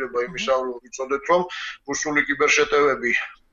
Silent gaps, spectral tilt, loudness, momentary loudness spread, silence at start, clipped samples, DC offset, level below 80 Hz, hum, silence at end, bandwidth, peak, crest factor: none; -2.5 dB/octave; -21 LUFS; 12 LU; 0 s; under 0.1%; under 0.1%; -54 dBFS; none; 0.2 s; 7.8 kHz; -6 dBFS; 16 dB